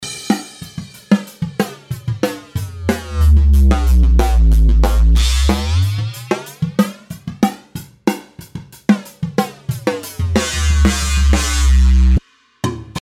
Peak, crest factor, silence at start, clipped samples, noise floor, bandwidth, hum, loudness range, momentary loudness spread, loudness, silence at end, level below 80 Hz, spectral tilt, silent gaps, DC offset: 0 dBFS; 14 dB; 0 s; under 0.1%; -33 dBFS; 14.5 kHz; none; 7 LU; 14 LU; -16 LUFS; 0.05 s; -16 dBFS; -5.5 dB/octave; none; under 0.1%